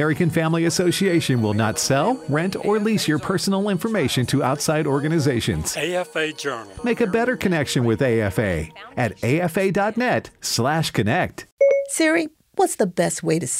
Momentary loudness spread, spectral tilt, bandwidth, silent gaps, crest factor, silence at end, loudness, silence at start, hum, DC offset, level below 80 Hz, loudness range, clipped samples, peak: 5 LU; -5 dB/octave; 16 kHz; 11.52-11.57 s; 14 dB; 0 s; -21 LUFS; 0 s; none; under 0.1%; -48 dBFS; 2 LU; under 0.1%; -8 dBFS